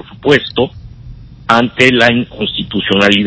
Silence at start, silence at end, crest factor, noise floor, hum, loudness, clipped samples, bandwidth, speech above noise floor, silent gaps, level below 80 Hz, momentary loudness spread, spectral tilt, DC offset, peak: 0.1 s; 0 s; 12 dB; -33 dBFS; none; -12 LUFS; 0.9%; 8 kHz; 21 dB; none; -38 dBFS; 10 LU; -5 dB/octave; under 0.1%; 0 dBFS